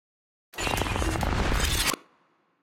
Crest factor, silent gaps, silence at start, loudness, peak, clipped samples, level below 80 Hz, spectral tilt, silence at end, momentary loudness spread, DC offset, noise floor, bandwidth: 18 dB; none; 0.55 s; -27 LUFS; -12 dBFS; under 0.1%; -34 dBFS; -3.5 dB/octave; 0.65 s; 9 LU; under 0.1%; -67 dBFS; 16.5 kHz